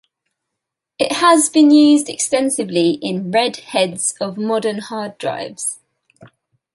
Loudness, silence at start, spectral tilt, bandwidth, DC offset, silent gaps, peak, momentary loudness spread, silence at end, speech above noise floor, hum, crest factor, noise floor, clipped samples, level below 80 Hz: -16 LUFS; 1 s; -3.5 dB/octave; 11.5 kHz; under 0.1%; none; 0 dBFS; 13 LU; 0.5 s; 65 dB; none; 16 dB; -81 dBFS; under 0.1%; -66 dBFS